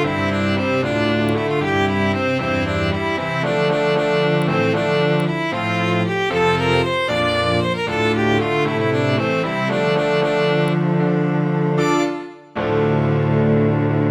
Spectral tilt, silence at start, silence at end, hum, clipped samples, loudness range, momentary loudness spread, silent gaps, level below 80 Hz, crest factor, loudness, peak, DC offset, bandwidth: -6.5 dB/octave; 0 s; 0 s; none; under 0.1%; 1 LU; 3 LU; none; -46 dBFS; 14 dB; -18 LUFS; -4 dBFS; under 0.1%; 12 kHz